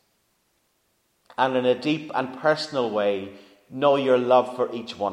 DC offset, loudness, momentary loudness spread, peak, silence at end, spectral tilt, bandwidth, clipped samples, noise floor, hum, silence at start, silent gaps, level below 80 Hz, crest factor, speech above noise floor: under 0.1%; -23 LUFS; 11 LU; -6 dBFS; 0 s; -5.5 dB/octave; 10.5 kHz; under 0.1%; -69 dBFS; none; 1.4 s; none; -74 dBFS; 20 dB; 47 dB